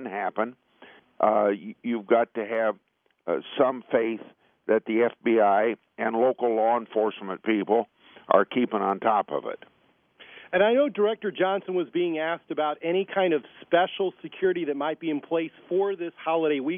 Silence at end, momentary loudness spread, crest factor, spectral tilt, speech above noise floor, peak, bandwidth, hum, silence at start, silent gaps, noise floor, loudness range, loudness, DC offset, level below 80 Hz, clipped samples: 0 s; 9 LU; 22 dB; -9 dB/octave; 32 dB; -4 dBFS; 3.7 kHz; none; 0 s; none; -57 dBFS; 2 LU; -26 LUFS; under 0.1%; -78 dBFS; under 0.1%